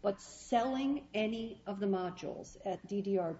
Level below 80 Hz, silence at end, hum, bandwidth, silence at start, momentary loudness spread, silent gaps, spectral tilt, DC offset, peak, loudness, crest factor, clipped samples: -66 dBFS; 0 s; none; 8 kHz; 0 s; 10 LU; none; -5 dB/octave; under 0.1%; -20 dBFS; -37 LUFS; 16 dB; under 0.1%